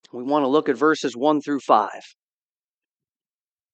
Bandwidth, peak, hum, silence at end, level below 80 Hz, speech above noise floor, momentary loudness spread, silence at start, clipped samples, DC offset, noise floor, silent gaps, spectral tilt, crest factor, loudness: 8.4 kHz; -2 dBFS; none; 1.75 s; -84 dBFS; over 69 dB; 6 LU; 0.15 s; under 0.1%; under 0.1%; under -90 dBFS; none; -5 dB/octave; 22 dB; -21 LUFS